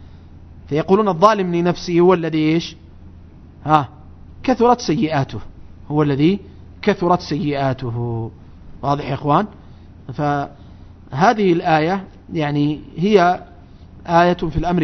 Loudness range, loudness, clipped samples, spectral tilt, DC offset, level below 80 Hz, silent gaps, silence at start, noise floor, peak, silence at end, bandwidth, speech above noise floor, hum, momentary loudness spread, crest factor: 4 LU; -18 LUFS; under 0.1%; -7 dB/octave; under 0.1%; -40 dBFS; none; 0 s; -41 dBFS; 0 dBFS; 0 s; 6.4 kHz; 24 dB; none; 13 LU; 18 dB